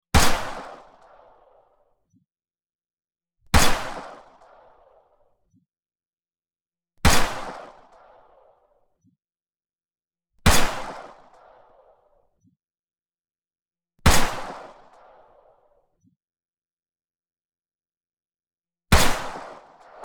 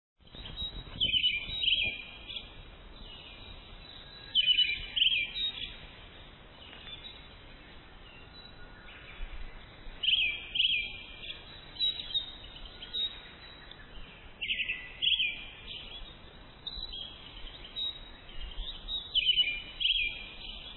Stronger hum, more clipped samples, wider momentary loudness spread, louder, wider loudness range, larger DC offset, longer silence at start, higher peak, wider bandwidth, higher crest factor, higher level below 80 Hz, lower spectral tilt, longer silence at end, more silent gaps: neither; neither; about the same, 23 LU vs 24 LU; first, -22 LUFS vs -30 LUFS; second, 4 LU vs 11 LU; neither; about the same, 0.15 s vs 0.25 s; first, -2 dBFS vs -16 dBFS; first, 20 kHz vs 4.3 kHz; about the same, 24 dB vs 20 dB; first, -32 dBFS vs -50 dBFS; second, -3.5 dB/octave vs -5 dB/octave; first, 0.5 s vs 0 s; first, 2.75-2.79 s, 2.93-2.97 s, 16.73-16.77 s, 17.45-17.49 s, 17.75-17.79 s, 17.97-18.01 s vs none